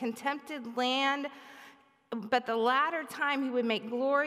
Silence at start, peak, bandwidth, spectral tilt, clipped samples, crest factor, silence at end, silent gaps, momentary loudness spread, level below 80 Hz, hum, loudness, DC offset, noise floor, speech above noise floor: 0 s; -14 dBFS; 15.5 kHz; -3.5 dB/octave; under 0.1%; 16 dB; 0 s; none; 13 LU; -86 dBFS; none; -31 LUFS; under 0.1%; -57 dBFS; 26 dB